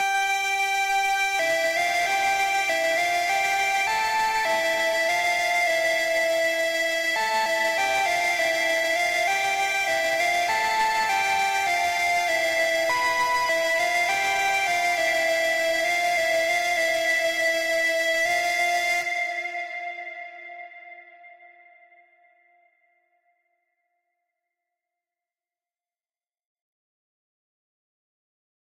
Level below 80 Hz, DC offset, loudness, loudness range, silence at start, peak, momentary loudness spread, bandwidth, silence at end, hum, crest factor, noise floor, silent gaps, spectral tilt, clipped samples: -62 dBFS; under 0.1%; -22 LUFS; 4 LU; 0 s; -14 dBFS; 1 LU; 16 kHz; 7.35 s; none; 10 dB; under -90 dBFS; none; 0 dB/octave; under 0.1%